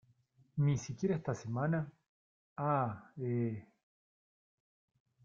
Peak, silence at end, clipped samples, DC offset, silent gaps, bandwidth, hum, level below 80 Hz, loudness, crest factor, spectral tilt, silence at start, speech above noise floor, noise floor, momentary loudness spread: -20 dBFS; 1.6 s; under 0.1%; under 0.1%; 2.08-2.56 s; 7.4 kHz; none; -70 dBFS; -36 LUFS; 18 dB; -7.5 dB/octave; 0.55 s; 35 dB; -70 dBFS; 11 LU